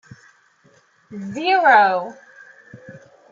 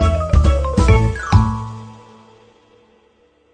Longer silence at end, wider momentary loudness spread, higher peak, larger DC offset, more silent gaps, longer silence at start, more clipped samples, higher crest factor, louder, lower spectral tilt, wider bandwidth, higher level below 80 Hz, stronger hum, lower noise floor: second, 0.35 s vs 1.6 s; first, 22 LU vs 14 LU; about the same, -2 dBFS vs 0 dBFS; neither; neither; first, 1.1 s vs 0 s; neither; about the same, 20 dB vs 16 dB; about the same, -16 LUFS vs -16 LUFS; second, -4.5 dB/octave vs -7 dB/octave; second, 7.4 kHz vs 9.6 kHz; second, -72 dBFS vs -20 dBFS; neither; about the same, -56 dBFS vs -56 dBFS